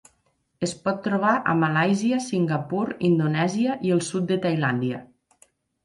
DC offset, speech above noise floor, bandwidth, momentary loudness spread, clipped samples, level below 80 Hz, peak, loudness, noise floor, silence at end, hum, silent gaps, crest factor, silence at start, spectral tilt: under 0.1%; 46 dB; 11.5 kHz; 6 LU; under 0.1%; -64 dBFS; -8 dBFS; -23 LUFS; -69 dBFS; 0.8 s; none; none; 16 dB; 0.6 s; -6 dB/octave